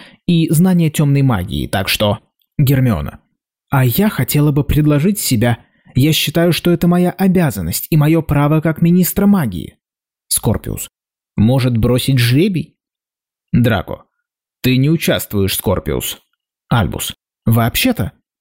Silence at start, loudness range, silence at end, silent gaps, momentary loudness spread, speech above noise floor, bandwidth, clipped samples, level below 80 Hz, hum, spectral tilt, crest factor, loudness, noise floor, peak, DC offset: 0 s; 4 LU; 0.3 s; none; 11 LU; 75 dB; 16.5 kHz; under 0.1%; -36 dBFS; none; -5.5 dB/octave; 10 dB; -15 LUFS; -89 dBFS; -4 dBFS; under 0.1%